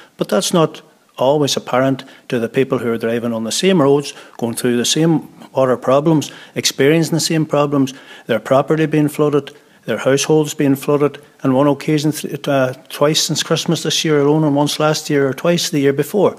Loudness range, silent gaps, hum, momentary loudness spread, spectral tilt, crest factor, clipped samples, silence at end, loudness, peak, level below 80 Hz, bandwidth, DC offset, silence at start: 2 LU; none; none; 7 LU; -4.5 dB/octave; 14 dB; under 0.1%; 0 s; -16 LUFS; -2 dBFS; -64 dBFS; 15.5 kHz; under 0.1%; 0.2 s